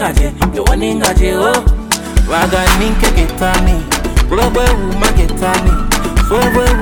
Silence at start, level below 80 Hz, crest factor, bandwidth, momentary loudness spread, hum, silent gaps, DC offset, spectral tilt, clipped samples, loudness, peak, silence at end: 0 s; -14 dBFS; 10 dB; 18.5 kHz; 3 LU; none; none; under 0.1%; -4.5 dB/octave; under 0.1%; -13 LUFS; 0 dBFS; 0 s